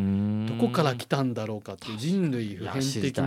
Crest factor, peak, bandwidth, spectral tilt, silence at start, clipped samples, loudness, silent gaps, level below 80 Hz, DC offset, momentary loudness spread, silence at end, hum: 18 dB; -8 dBFS; 15.5 kHz; -6 dB/octave; 0 s; under 0.1%; -28 LUFS; none; -66 dBFS; under 0.1%; 8 LU; 0 s; none